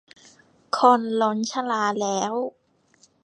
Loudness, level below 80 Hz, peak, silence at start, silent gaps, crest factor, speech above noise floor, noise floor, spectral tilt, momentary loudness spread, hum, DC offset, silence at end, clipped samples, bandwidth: -23 LUFS; -78 dBFS; -2 dBFS; 0.75 s; none; 22 dB; 39 dB; -61 dBFS; -4 dB/octave; 12 LU; none; under 0.1%; 0.75 s; under 0.1%; 9.8 kHz